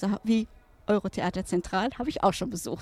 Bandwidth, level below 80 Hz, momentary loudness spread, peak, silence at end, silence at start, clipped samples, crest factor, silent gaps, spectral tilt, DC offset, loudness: 15 kHz; -50 dBFS; 6 LU; -10 dBFS; 0 s; 0 s; under 0.1%; 20 dB; none; -5.5 dB/octave; under 0.1%; -28 LUFS